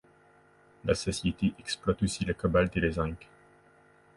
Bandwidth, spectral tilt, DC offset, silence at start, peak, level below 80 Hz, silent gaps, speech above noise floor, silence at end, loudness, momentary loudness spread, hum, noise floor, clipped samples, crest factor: 11.5 kHz; -5.5 dB/octave; under 0.1%; 0.85 s; -12 dBFS; -46 dBFS; none; 32 dB; 0.95 s; -30 LUFS; 8 LU; none; -61 dBFS; under 0.1%; 20 dB